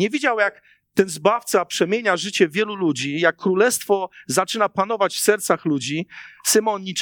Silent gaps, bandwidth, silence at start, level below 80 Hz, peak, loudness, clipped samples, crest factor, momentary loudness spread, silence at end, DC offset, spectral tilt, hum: none; 19 kHz; 0 s; -72 dBFS; -2 dBFS; -20 LUFS; under 0.1%; 20 dB; 5 LU; 0 s; under 0.1%; -3.5 dB/octave; none